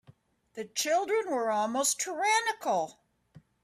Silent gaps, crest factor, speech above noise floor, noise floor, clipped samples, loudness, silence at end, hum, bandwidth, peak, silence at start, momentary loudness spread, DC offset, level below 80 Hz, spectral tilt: none; 18 dB; 32 dB; -61 dBFS; under 0.1%; -29 LUFS; 0.25 s; none; 15.5 kHz; -14 dBFS; 0.1 s; 11 LU; under 0.1%; -78 dBFS; -1 dB/octave